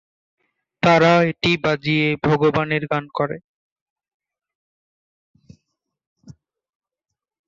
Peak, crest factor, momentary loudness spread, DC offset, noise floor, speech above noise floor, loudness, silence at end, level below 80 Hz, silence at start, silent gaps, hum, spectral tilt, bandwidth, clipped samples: -4 dBFS; 20 dB; 11 LU; under 0.1%; -84 dBFS; 66 dB; -18 LUFS; 1.15 s; -56 dBFS; 0.85 s; 3.44-3.96 s, 4.14-4.20 s, 4.55-5.34 s, 6.07-6.16 s; none; -6.5 dB/octave; 7.6 kHz; under 0.1%